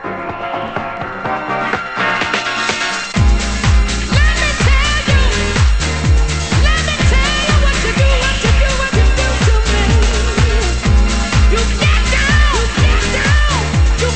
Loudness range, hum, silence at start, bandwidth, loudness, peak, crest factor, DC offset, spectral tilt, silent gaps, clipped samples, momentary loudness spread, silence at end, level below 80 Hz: 3 LU; none; 0 s; 8.8 kHz; -14 LUFS; 0 dBFS; 12 dB; under 0.1%; -4.5 dB/octave; none; under 0.1%; 5 LU; 0 s; -16 dBFS